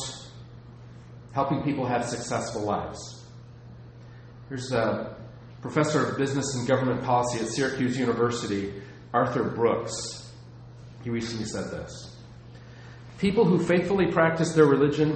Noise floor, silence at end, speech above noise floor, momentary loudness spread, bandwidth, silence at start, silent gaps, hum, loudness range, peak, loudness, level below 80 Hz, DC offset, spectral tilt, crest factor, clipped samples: -46 dBFS; 0 s; 20 dB; 24 LU; 8.8 kHz; 0 s; none; none; 7 LU; -6 dBFS; -26 LUFS; -54 dBFS; under 0.1%; -5.5 dB/octave; 22 dB; under 0.1%